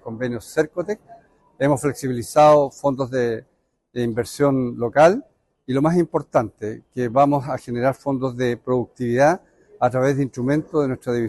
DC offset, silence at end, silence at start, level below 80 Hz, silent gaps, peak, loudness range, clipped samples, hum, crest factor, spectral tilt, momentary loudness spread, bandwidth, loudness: under 0.1%; 0 s; 0.05 s; -54 dBFS; none; -4 dBFS; 2 LU; under 0.1%; none; 18 dB; -7 dB/octave; 12 LU; 12.5 kHz; -21 LUFS